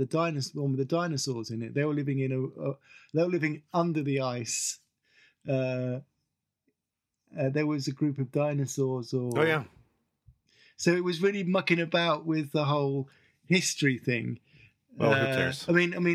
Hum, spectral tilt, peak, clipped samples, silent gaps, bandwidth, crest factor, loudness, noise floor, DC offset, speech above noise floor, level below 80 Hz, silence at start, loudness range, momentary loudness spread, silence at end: none; -5 dB/octave; -8 dBFS; under 0.1%; none; 14.5 kHz; 20 dB; -29 LUFS; -86 dBFS; under 0.1%; 58 dB; -74 dBFS; 0 s; 5 LU; 9 LU; 0 s